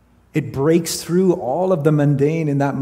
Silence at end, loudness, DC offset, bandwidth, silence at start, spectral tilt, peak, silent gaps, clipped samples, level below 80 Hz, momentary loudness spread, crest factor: 0 s; -18 LUFS; under 0.1%; 16 kHz; 0.35 s; -6.5 dB/octave; -2 dBFS; none; under 0.1%; -54 dBFS; 6 LU; 16 dB